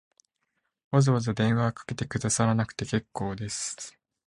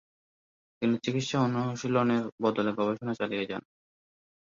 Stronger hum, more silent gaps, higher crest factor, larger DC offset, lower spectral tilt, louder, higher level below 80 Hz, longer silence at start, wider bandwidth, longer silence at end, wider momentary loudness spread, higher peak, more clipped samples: neither; second, none vs 2.32-2.38 s; about the same, 20 dB vs 18 dB; neither; about the same, -5.5 dB/octave vs -6 dB/octave; about the same, -27 LUFS vs -29 LUFS; first, -56 dBFS vs -70 dBFS; about the same, 0.9 s vs 0.8 s; first, 11 kHz vs 7.6 kHz; second, 0.35 s vs 1 s; first, 10 LU vs 5 LU; first, -8 dBFS vs -12 dBFS; neither